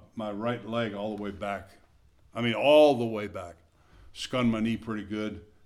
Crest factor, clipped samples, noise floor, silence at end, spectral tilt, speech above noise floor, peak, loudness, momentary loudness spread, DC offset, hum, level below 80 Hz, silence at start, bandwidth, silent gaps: 20 dB; under 0.1%; -60 dBFS; 0.2 s; -6 dB/octave; 32 dB; -8 dBFS; -28 LUFS; 18 LU; under 0.1%; none; -58 dBFS; 0.15 s; 12.5 kHz; none